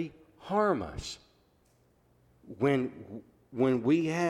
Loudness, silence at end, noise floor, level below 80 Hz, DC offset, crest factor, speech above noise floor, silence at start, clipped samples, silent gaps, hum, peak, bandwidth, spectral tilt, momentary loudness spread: -30 LUFS; 0 s; -67 dBFS; -58 dBFS; under 0.1%; 16 dB; 38 dB; 0 s; under 0.1%; none; none; -16 dBFS; 12.5 kHz; -6.5 dB/octave; 20 LU